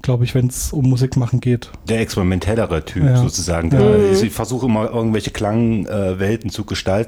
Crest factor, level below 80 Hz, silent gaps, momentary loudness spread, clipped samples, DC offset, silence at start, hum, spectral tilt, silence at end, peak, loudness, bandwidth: 14 dB; -34 dBFS; none; 7 LU; under 0.1%; under 0.1%; 0.05 s; none; -6.5 dB/octave; 0 s; -2 dBFS; -17 LUFS; 16 kHz